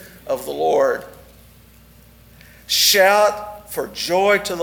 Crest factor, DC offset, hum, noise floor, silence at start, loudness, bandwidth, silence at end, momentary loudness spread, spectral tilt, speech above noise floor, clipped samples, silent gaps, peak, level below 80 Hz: 18 dB; under 0.1%; none; -47 dBFS; 0 s; -17 LUFS; over 20 kHz; 0 s; 16 LU; -1.5 dB/octave; 30 dB; under 0.1%; none; -2 dBFS; -52 dBFS